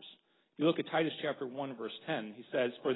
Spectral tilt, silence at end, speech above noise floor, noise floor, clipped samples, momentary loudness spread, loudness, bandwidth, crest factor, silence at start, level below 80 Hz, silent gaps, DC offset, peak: -3.5 dB/octave; 0 s; 26 dB; -61 dBFS; under 0.1%; 8 LU; -36 LUFS; 4 kHz; 18 dB; 0 s; -82 dBFS; none; under 0.1%; -18 dBFS